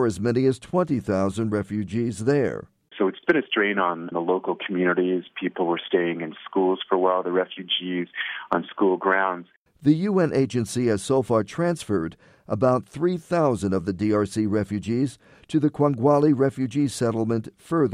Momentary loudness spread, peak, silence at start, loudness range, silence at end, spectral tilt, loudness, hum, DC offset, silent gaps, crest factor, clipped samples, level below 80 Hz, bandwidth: 6 LU; -6 dBFS; 0 s; 2 LU; 0 s; -6 dB/octave; -24 LUFS; none; under 0.1%; 9.56-9.66 s; 16 dB; under 0.1%; -58 dBFS; 13 kHz